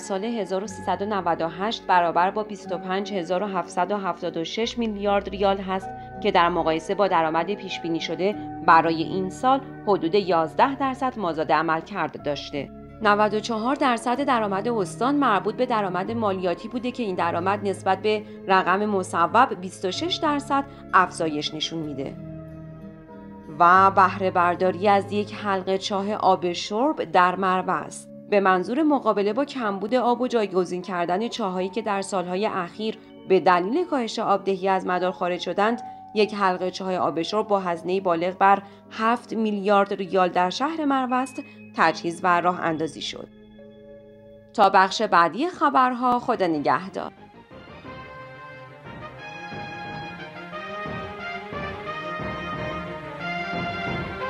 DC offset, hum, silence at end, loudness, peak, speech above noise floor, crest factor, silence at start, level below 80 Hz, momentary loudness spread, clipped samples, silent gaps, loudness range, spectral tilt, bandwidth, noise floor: under 0.1%; none; 0 s; -23 LUFS; -4 dBFS; 25 dB; 20 dB; 0 s; -56 dBFS; 14 LU; under 0.1%; none; 7 LU; -5 dB/octave; 12 kHz; -47 dBFS